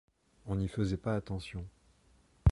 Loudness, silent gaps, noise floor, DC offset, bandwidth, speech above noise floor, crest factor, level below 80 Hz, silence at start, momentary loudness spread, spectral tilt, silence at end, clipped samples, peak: -36 LUFS; none; -66 dBFS; under 0.1%; 11.5 kHz; 31 dB; 22 dB; -44 dBFS; 0.45 s; 15 LU; -8 dB/octave; 0 s; under 0.1%; -12 dBFS